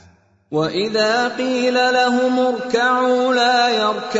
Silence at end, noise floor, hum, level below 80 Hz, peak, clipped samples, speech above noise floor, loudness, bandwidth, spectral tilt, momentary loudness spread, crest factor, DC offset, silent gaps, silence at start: 0 s; -52 dBFS; none; -62 dBFS; -4 dBFS; under 0.1%; 35 dB; -17 LUFS; 8 kHz; -3.5 dB/octave; 5 LU; 14 dB; under 0.1%; none; 0.5 s